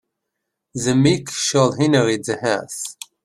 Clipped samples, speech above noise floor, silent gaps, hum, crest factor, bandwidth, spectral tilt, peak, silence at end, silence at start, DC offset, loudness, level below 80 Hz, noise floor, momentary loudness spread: under 0.1%; 60 dB; none; none; 18 dB; 14 kHz; -4.5 dB/octave; -2 dBFS; 0.35 s; 0.75 s; under 0.1%; -19 LUFS; -56 dBFS; -79 dBFS; 12 LU